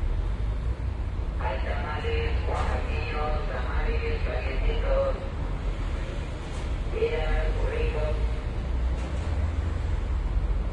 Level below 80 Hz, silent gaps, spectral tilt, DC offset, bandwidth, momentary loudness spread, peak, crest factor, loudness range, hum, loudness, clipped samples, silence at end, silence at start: -28 dBFS; none; -7 dB/octave; under 0.1%; 9.2 kHz; 5 LU; -14 dBFS; 14 dB; 1 LU; none; -30 LUFS; under 0.1%; 0 s; 0 s